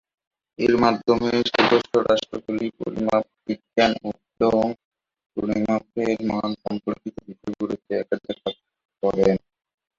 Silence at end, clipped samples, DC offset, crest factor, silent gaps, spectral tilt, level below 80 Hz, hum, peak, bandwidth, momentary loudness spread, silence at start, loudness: 0.6 s; under 0.1%; under 0.1%; 20 dB; 4.85-4.92 s, 5.26-5.30 s, 8.85-8.89 s; -6 dB/octave; -54 dBFS; none; -2 dBFS; 7.6 kHz; 13 LU; 0.6 s; -23 LUFS